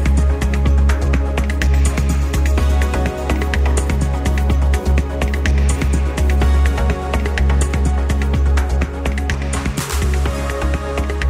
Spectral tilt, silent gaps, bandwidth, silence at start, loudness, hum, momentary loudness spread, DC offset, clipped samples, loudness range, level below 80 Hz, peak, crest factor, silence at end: -6 dB/octave; none; 14 kHz; 0 s; -18 LUFS; none; 5 LU; under 0.1%; under 0.1%; 1 LU; -16 dBFS; -4 dBFS; 12 dB; 0 s